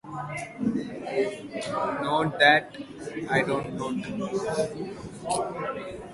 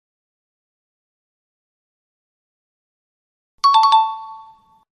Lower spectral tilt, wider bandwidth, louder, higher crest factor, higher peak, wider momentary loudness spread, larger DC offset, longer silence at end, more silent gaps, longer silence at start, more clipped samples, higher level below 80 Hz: first, -4.5 dB/octave vs 3 dB/octave; about the same, 11.5 kHz vs 11.5 kHz; second, -27 LUFS vs -15 LUFS; about the same, 22 dB vs 20 dB; about the same, -6 dBFS vs -4 dBFS; second, 17 LU vs 21 LU; neither; second, 0 s vs 0.65 s; neither; second, 0.05 s vs 3.65 s; neither; first, -58 dBFS vs -78 dBFS